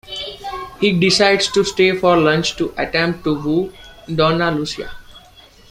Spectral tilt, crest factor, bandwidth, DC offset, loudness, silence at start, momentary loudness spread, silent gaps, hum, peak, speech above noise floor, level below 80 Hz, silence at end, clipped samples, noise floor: -4.5 dB/octave; 16 dB; 15.5 kHz; under 0.1%; -16 LUFS; 0.05 s; 15 LU; none; none; -2 dBFS; 29 dB; -44 dBFS; 0.5 s; under 0.1%; -45 dBFS